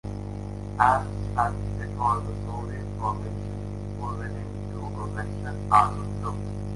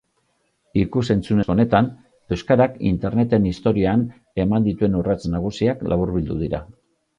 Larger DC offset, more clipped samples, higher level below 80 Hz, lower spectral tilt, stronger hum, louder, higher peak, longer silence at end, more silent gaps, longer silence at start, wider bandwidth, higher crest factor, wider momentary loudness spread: neither; neither; about the same, -40 dBFS vs -40 dBFS; second, -7 dB/octave vs -8.5 dB/octave; first, 50 Hz at -35 dBFS vs none; second, -28 LUFS vs -21 LUFS; about the same, -4 dBFS vs -2 dBFS; second, 0 s vs 0.55 s; neither; second, 0.05 s vs 0.75 s; first, 11.5 kHz vs 9.8 kHz; first, 24 dB vs 18 dB; first, 13 LU vs 8 LU